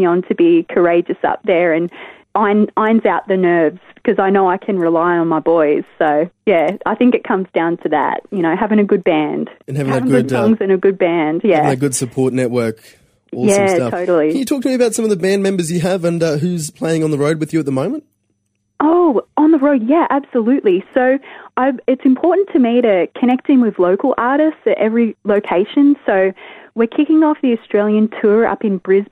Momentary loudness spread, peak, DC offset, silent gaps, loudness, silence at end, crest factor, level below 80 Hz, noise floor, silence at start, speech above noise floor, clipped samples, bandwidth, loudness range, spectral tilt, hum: 6 LU; 0 dBFS; under 0.1%; none; -15 LUFS; 0.05 s; 14 dB; -58 dBFS; -66 dBFS; 0 s; 52 dB; under 0.1%; 15.5 kHz; 2 LU; -6 dB/octave; none